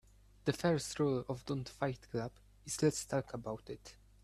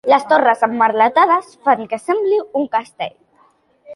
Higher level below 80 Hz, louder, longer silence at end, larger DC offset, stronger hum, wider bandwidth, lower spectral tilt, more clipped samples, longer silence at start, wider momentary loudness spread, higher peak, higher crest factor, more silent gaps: first, -62 dBFS vs -68 dBFS; second, -38 LUFS vs -16 LUFS; first, 0.3 s vs 0 s; neither; neither; first, 14.5 kHz vs 11.5 kHz; about the same, -5 dB/octave vs -4.5 dB/octave; neither; first, 0.45 s vs 0.05 s; first, 14 LU vs 9 LU; second, -18 dBFS vs -2 dBFS; about the same, 20 dB vs 16 dB; neither